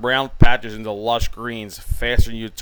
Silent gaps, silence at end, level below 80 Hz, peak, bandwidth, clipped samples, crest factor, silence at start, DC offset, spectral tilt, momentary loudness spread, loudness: none; 0 s; -24 dBFS; 0 dBFS; 19.5 kHz; 0.2%; 18 dB; 0 s; under 0.1%; -5 dB/octave; 11 LU; -22 LUFS